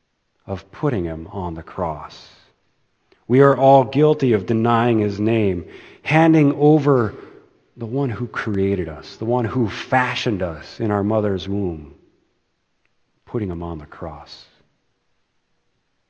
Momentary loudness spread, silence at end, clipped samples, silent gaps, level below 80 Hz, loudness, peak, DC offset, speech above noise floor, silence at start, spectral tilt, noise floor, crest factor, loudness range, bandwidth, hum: 18 LU; 1.75 s; under 0.1%; none; -50 dBFS; -19 LUFS; 0 dBFS; under 0.1%; 50 dB; 0.45 s; -8 dB/octave; -68 dBFS; 20 dB; 16 LU; 8.4 kHz; none